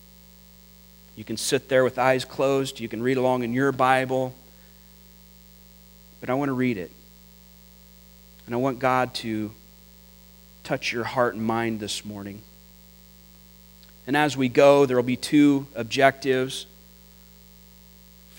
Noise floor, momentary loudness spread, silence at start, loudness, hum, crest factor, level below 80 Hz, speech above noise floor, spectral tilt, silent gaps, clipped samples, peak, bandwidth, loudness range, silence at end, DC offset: -50 dBFS; 16 LU; 1.15 s; -23 LUFS; 60 Hz at -55 dBFS; 24 dB; -56 dBFS; 28 dB; -5 dB/octave; none; under 0.1%; -2 dBFS; 16 kHz; 9 LU; 1.75 s; under 0.1%